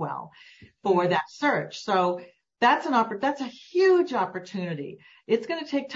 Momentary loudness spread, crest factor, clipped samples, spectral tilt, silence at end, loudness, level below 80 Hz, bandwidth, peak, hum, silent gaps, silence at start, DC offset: 14 LU; 18 dB; under 0.1%; -5.5 dB/octave; 0 s; -25 LUFS; -74 dBFS; 7.8 kHz; -8 dBFS; none; none; 0 s; under 0.1%